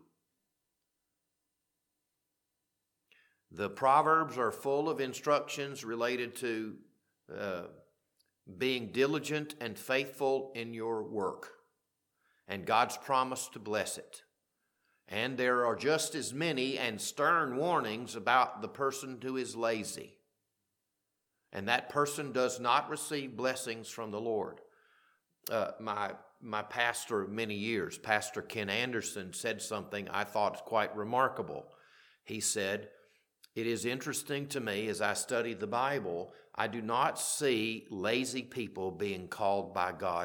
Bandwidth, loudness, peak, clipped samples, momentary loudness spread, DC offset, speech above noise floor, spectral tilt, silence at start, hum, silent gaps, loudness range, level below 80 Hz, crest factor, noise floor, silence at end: 19 kHz; -34 LUFS; -10 dBFS; under 0.1%; 11 LU; under 0.1%; 51 dB; -3.5 dB/octave; 3.5 s; none; none; 5 LU; -80 dBFS; 24 dB; -85 dBFS; 0 s